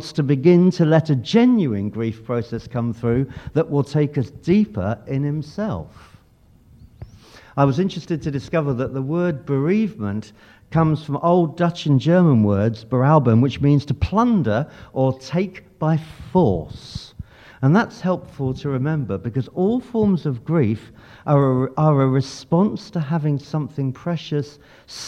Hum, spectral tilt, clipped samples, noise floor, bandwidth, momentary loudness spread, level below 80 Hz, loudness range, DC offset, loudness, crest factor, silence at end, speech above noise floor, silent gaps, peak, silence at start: none; -8.5 dB/octave; under 0.1%; -53 dBFS; 8.8 kHz; 11 LU; -46 dBFS; 7 LU; under 0.1%; -20 LUFS; 18 dB; 0 s; 33 dB; none; -2 dBFS; 0 s